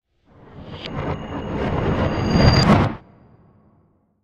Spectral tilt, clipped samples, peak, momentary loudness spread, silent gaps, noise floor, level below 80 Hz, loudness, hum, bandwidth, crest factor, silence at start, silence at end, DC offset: -6.5 dB/octave; under 0.1%; 0 dBFS; 21 LU; none; -60 dBFS; -32 dBFS; -20 LUFS; none; 10.5 kHz; 20 dB; 0.55 s; 1.25 s; under 0.1%